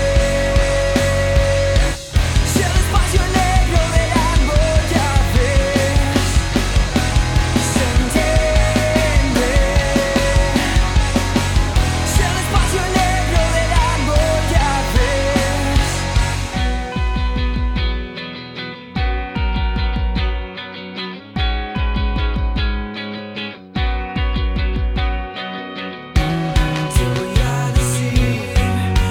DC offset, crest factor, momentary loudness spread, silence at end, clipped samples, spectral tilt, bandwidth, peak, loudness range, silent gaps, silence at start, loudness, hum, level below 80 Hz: under 0.1%; 14 dB; 9 LU; 0 s; under 0.1%; -5 dB/octave; 17 kHz; -2 dBFS; 6 LU; none; 0 s; -18 LUFS; none; -20 dBFS